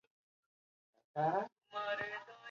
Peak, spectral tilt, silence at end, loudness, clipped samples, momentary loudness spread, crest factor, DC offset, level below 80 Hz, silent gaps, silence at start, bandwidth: -24 dBFS; -3 dB/octave; 0 s; -40 LUFS; under 0.1%; 10 LU; 18 dB; under 0.1%; -84 dBFS; 1.52-1.56 s; 1.15 s; 7.2 kHz